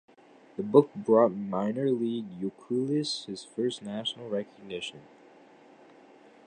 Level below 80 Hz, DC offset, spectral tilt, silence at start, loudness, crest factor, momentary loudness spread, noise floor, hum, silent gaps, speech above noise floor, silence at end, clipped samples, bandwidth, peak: -76 dBFS; under 0.1%; -6 dB/octave; 0.6 s; -29 LUFS; 24 dB; 14 LU; -55 dBFS; none; none; 27 dB; 1.45 s; under 0.1%; 9.8 kHz; -6 dBFS